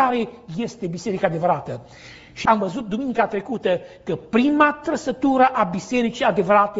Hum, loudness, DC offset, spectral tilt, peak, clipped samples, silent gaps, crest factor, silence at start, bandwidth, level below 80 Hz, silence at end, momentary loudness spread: none; -21 LUFS; under 0.1%; -4.5 dB/octave; -2 dBFS; under 0.1%; none; 18 dB; 0 s; 8 kHz; -54 dBFS; 0 s; 12 LU